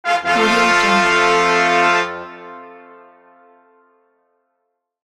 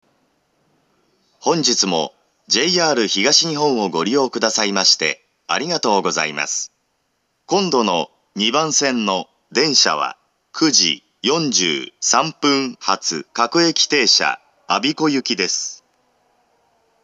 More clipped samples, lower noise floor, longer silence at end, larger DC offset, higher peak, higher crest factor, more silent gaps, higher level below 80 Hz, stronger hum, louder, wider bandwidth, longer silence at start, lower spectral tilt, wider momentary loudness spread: neither; first, -73 dBFS vs -68 dBFS; first, 2.3 s vs 1.3 s; neither; about the same, -2 dBFS vs 0 dBFS; about the same, 16 dB vs 20 dB; neither; first, -54 dBFS vs -78 dBFS; neither; first, -14 LUFS vs -17 LUFS; first, 14 kHz vs 11 kHz; second, 0.05 s vs 1.45 s; about the same, -3 dB/octave vs -2 dB/octave; first, 20 LU vs 9 LU